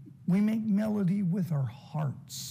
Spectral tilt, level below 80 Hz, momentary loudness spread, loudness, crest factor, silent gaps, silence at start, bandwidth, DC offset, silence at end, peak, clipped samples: -7 dB/octave; -70 dBFS; 8 LU; -30 LUFS; 12 dB; none; 0 s; 15.5 kHz; under 0.1%; 0 s; -18 dBFS; under 0.1%